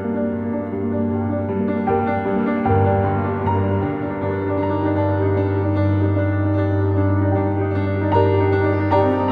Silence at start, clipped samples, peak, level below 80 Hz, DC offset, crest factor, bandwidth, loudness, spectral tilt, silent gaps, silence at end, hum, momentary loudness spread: 0 s; under 0.1%; -4 dBFS; -46 dBFS; under 0.1%; 14 dB; 4.9 kHz; -20 LUFS; -11 dB/octave; none; 0 s; none; 5 LU